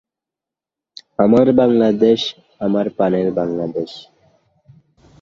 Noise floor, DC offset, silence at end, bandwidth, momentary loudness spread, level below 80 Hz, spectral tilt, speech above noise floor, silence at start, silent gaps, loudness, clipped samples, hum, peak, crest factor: -87 dBFS; under 0.1%; 1.2 s; 7.4 kHz; 14 LU; -56 dBFS; -7.5 dB/octave; 71 dB; 1.2 s; none; -16 LUFS; under 0.1%; none; -2 dBFS; 16 dB